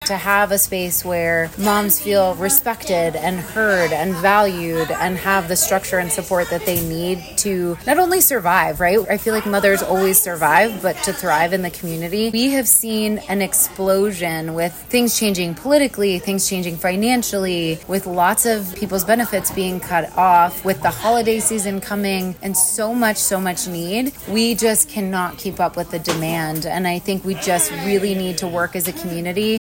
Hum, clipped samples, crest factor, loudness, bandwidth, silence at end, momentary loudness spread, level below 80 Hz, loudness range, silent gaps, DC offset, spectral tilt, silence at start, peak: none; under 0.1%; 16 dB; -18 LUFS; 19 kHz; 0.05 s; 8 LU; -46 dBFS; 3 LU; none; under 0.1%; -3.5 dB/octave; 0 s; -2 dBFS